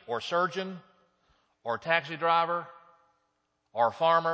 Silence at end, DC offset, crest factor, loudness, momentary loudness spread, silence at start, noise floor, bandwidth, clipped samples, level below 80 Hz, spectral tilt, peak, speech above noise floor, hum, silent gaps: 0 s; under 0.1%; 22 dB; -28 LUFS; 16 LU; 0.1 s; -77 dBFS; 8 kHz; under 0.1%; -78 dBFS; -5 dB/octave; -10 dBFS; 49 dB; none; none